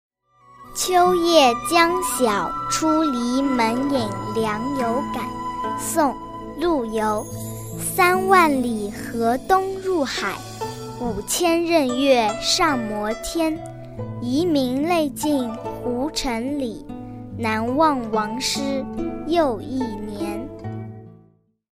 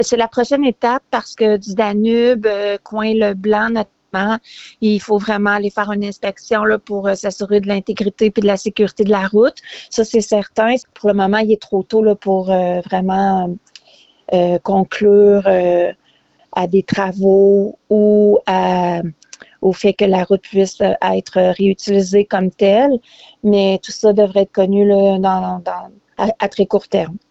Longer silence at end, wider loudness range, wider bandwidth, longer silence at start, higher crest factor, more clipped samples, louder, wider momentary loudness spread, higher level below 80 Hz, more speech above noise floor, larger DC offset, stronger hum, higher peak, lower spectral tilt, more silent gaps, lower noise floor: first, 0.65 s vs 0.15 s; about the same, 5 LU vs 3 LU; first, 16 kHz vs 8.2 kHz; first, 0.6 s vs 0 s; first, 20 dB vs 12 dB; neither; second, -21 LUFS vs -15 LUFS; first, 14 LU vs 8 LU; first, -46 dBFS vs -52 dBFS; second, 37 dB vs 41 dB; neither; neither; about the same, -2 dBFS vs -2 dBFS; second, -4 dB/octave vs -6 dB/octave; neither; about the same, -57 dBFS vs -55 dBFS